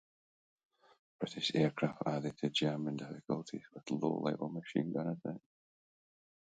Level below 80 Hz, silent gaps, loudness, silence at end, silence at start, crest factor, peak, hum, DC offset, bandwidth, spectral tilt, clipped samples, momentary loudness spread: -78 dBFS; none; -37 LUFS; 1.1 s; 1.2 s; 20 dB; -20 dBFS; none; under 0.1%; 9 kHz; -6 dB/octave; under 0.1%; 11 LU